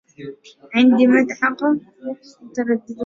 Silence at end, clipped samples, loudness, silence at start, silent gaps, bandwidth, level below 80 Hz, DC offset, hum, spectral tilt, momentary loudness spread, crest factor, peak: 0 s; under 0.1%; -17 LUFS; 0.2 s; none; 7.4 kHz; -64 dBFS; under 0.1%; none; -5.5 dB/octave; 22 LU; 16 dB; -4 dBFS